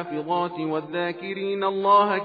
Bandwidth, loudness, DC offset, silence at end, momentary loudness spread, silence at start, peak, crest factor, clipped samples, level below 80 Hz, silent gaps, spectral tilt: 5 kHz; -24 LUFS; under 0.1%; 0 s; 10 LU; 0 s; -8 dBFS; 16 dB; under 0.1%; -78 dBFS; none; -8.5 dB/octave